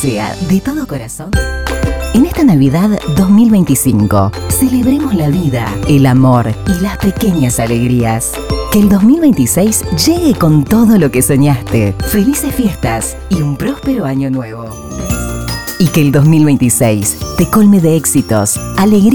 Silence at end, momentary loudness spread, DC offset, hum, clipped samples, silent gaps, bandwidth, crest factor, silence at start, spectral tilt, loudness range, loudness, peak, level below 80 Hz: 0 s; 10 LU; 0.6%; none; under 0.1%; none; 20 kHz; 10 dB; 0 s; -5.5 dB/octave; 5 LU; -11 LUFS; 0 dBFS; -26 dBFS